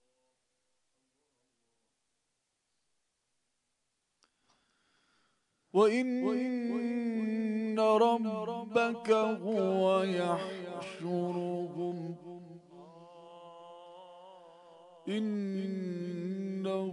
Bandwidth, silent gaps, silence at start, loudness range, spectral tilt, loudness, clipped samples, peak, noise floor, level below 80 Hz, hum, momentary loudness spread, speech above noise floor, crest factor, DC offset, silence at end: 11 kHz; none; 5.75 s; 12 LU; -6.5 dB/octave; -32 LUFS; under 0.1%; -14 dBFS; -82 dBFS; -90 dBFS; none; 24 LU; 51 dB; 20 dB; under 0.1%; 0 s